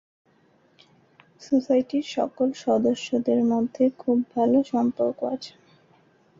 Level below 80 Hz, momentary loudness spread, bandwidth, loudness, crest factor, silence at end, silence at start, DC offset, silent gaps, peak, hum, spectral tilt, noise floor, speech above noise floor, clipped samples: -68 dBFS; 7 LU; 7.6 kHz; -24 LUFS; 16 dB; 0.9 s; 1.4 s; under 0.1%; none; -10 dBFS; none; -6 dB/octave; -61 dBFS; 38 dB; under 0.1%